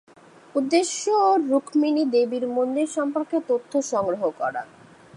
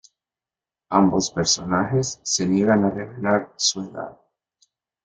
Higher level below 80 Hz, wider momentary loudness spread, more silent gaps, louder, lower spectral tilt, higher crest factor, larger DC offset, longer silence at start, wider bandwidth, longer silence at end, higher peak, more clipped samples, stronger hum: second, -72 dBFS vs -56 dBFS; about the same, 9 LU vs 11 LU; neither; about the same, -23 LUFS vs -21 LUFS; about the same, -3.5 dB/octave vs -4 dB/octave; about the same, 16 dB vs 20 dB; neither; second, 0.55 s vs 0.9 s; first, 11 kHz vs 9.4 kHz; second, 0.5 s vs 0.95 s; second, -6 dBFS vs -2 dBFS; neither; neither